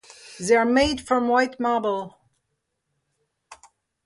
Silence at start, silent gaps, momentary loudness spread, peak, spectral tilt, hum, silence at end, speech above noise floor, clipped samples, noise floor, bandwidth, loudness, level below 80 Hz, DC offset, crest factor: 0.25 s; none; 14 LU; -6 dBFS; -4 dB/octave; none; 0.5 s; 56 dB; under 0.1%; -77 dBFS; 11.5 kHz; -22 LUFS; -50 dBFS; under 0.1%; 18 dB